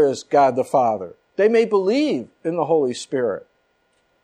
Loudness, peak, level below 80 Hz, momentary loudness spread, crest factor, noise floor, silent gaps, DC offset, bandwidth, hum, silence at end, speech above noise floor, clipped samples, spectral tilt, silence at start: -20 LUFS; -6 dBFS; -70 dBFS; 9 LU; 14 dB; -65 dBFS; none; under 0.1%; 10.5 kHz; none; 0.85 s; 46 dB; under 0.1%; -5.5 dB/octave; 0 s